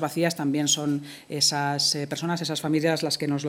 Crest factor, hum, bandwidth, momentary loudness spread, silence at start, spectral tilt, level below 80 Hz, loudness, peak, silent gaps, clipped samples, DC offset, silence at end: 16 dB; none; 18 kHz; 6 LU; 0 s; -3.5 dB/octave; -70 dBFS; -24 LUFS; -8 dBFS; none; under 0.1%; under 0.1%; 0 s